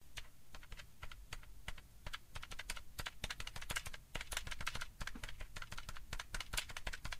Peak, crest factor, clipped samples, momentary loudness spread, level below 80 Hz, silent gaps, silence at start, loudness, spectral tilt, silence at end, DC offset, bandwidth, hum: -22 dBFS; 24 dB; under 0.1%; 13 LU; -52 dBFS; none; 0 s; -48 LUFS; -1.5 dB/octave; 0 s; 0.1%; 16 kHz; none